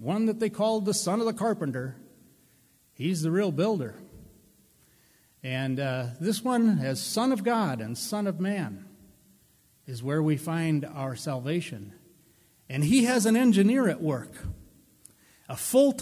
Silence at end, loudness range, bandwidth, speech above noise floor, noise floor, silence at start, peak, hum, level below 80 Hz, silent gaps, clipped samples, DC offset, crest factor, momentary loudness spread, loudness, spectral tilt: 0 s; 6 LU; 16 kHz; 36 dB; -63 dBFS; 0 s; -10 dBFS; none; -58 dBFS; none; under 0.1%; under 0.1%; 18 dB; 17 LU; -27 LUFS; -5.5 dB/octave